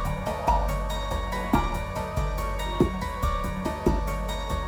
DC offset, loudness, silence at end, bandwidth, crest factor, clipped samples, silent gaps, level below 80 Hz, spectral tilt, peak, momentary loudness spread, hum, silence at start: under 0.1%; -28 LUFS; 0 s; 19.5 kHz; 18 dB; under 0.1%; none; -30 dBFS; -6 dB/octave; -8 dBFS; 5 LU; none; 0 s